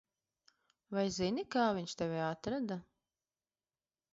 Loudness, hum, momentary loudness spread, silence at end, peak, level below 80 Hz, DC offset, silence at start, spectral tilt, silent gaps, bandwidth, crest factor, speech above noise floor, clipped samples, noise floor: -37 LUFS; none; 8 LU; 1.3 s; -20 dBFS; -70 dBFS; under 0.1%; 0.9 s; -4.5 dB/octave; none; 7.6 kHz; 20 dB; over 54 dB; under 0.1%; under -90 dBFS